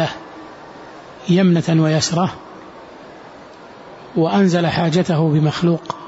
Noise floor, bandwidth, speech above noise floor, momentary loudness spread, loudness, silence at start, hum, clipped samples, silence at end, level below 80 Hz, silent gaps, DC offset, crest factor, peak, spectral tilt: -39 dBFS; 8 kHz; 23 dB; 23 LU; -17 LUFS; 0 s; none; under 0.1%; 0 s; -54 dBFS; none; under 0.1%; 14 dB; -6 dBFS; -6 dB/octave